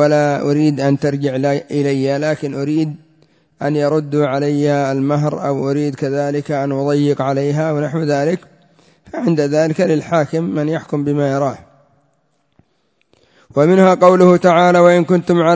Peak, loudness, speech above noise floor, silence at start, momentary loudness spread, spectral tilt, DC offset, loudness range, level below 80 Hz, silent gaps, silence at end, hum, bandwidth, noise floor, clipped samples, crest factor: 0 dBFS; -15 LUFS; 49 dB; 0 s; 10 LU; -7.5 dB/octave; under 0.1%; 5 LU; -58 dBFS; none; 0 s; none; 8 kHz; -63 dBFS; under 0.1%; 16 dB